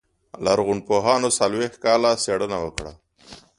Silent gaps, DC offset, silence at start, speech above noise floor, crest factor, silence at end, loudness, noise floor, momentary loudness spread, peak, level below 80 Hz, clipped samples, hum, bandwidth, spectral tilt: none; under 0.1%; 0.35 s; 26 dB; 20 dB; 0.25 s; -21 LUFS; -47 dBFS; 10 LU; -2 dBFS; -50 dBFS; under 0.1%; none; 11.5 kHz; -3.5 dB/octave